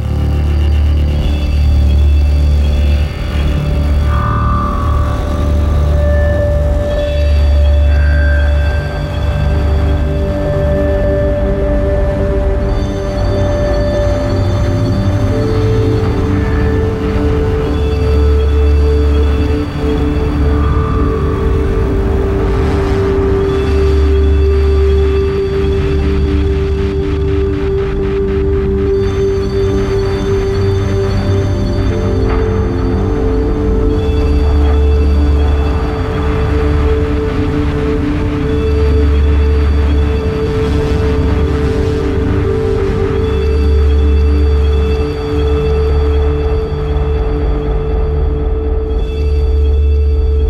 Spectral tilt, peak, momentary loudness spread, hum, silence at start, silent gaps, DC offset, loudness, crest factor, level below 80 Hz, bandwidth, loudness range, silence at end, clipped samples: -8 dB/octave; -2 dBFS; 4 LU; none; 0 s; none; under 0.1%; -14 LUFS; 10 dB; -14 dBFS; 7 kHz; 2 LU; 0 s; under 0.1%